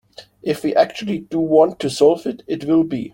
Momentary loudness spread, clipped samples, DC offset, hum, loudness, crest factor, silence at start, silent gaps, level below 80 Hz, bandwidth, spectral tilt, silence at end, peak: 10 LU; under 0.1%; under 0.1%; none; -18 LUFS; 16 dB; 0.2 s; none; -58 dBFS; 16.5 kHz; -6 dB/octave; 0.05 s; -2 dBFS